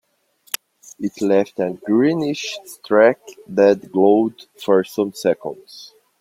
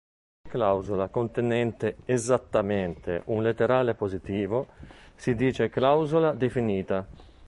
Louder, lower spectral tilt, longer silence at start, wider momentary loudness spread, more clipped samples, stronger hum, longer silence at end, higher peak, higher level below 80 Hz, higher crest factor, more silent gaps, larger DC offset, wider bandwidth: first, -19 LUFS vs -27 LUFS; about the same, -5.5 dB/octave vs -6.5 dB/octave; about the same, 0.55 s vs 0.45 s; first, 16 LU vs 8 LU; neither; neither; first, 0.35 s vs 0 s; first, 0 dBFS vs -8 dBFS; second, -66 dBFS vs -52 dBFS; about the same, 18 dB vs 18 dB; neither; neither; first, 16 kHz vs 11.5 kHz